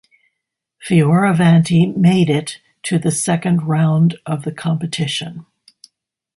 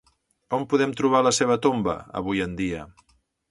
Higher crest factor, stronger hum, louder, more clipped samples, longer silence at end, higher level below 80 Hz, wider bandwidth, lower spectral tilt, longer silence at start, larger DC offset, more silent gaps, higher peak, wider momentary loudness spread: about the same, 16 dB vs 18 dB; neither; first, -16 LUFS vs -23 LUFS; neither; first, 0.95 s vs 0.6 s; about the same, -56 dBFS vs -52 dBFS; about the same, 11.5 kHz vs 11.5 kHz; first, -6 dB/octave vs -4.5 dB/octave; first, 0.8 s vs 0.5 s; neither; neither; first, 0 dBFS vs -6 dBFS; about the same, 11 LU vs 10 LU